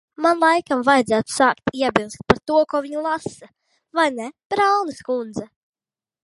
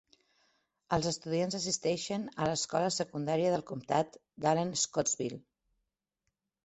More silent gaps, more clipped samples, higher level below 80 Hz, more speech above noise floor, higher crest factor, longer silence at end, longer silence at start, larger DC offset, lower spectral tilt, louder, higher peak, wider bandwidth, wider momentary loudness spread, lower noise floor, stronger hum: first, 4.45-4.50 s vs none; neither; first, -52 dBFS vs -66 dBFS; first, over 70 dB vs 53 dB; about the same, 20 dB vs 20 dB; second, 0.8 s vs 1.25 s; second, 0.2 s vs 0.9 s; neither; about the same, -4.5 dB/octave vs -4 dB/octave; first, -20 LUFS vs -33 LUFS; first, 0 dBFS vs -14 dBFS; first, 11.5 kHz vs 8.4 kHz; first, 10 LU vs 5 LU; first, under -90 dBFS vs -85 dBFS; neither